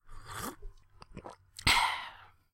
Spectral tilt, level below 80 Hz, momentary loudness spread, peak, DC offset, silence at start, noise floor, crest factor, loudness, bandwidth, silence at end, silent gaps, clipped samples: -1.5 dB/octave; -48 dBFS; 24 LU; -12 dBFS; under 0.1%; 0.05 s; -54 dBFS; 24 dB; -31 LUFS; 16.5 kHz; 0.25 s; none; under 0.1%